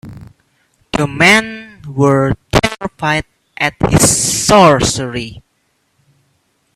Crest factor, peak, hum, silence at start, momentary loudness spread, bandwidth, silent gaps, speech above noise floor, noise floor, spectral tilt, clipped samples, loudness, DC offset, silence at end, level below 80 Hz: 14 dB; 0 dBFS; none; 0.05 s; 17 LU; 15.5 kHz; none; 50 dB; -62 dBFS; -3.5 dB/octave; under 0.1%; -12 LUFS; under 0.1%; 1.35 s; -34 dBFS